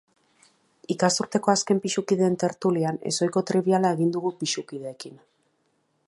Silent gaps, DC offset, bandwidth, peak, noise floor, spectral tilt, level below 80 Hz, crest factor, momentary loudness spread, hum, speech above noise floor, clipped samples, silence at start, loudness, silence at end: none; under 0.1%; 11.5 kHz; -6 dBFS; -70 dBFS; -4.5 dB/octave; -72 dBFS; 20 dB; 13 LU; none; 46 dB; under 0.1%; 0.9 s; -24 LUFS; 0.9 s